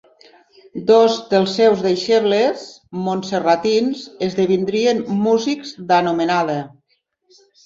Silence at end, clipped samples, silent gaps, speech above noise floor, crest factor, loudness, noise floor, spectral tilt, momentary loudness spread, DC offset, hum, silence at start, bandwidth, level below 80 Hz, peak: 0.95 s; under 0.1%; none; 49 dB; 16 dB; -17 LUFS; -66 dBFS; -5.5 dB/octave; 11 LU; under 0.1%; none; 0.75 s; 7.8 kHz; -62 dBFS; -2 dBFS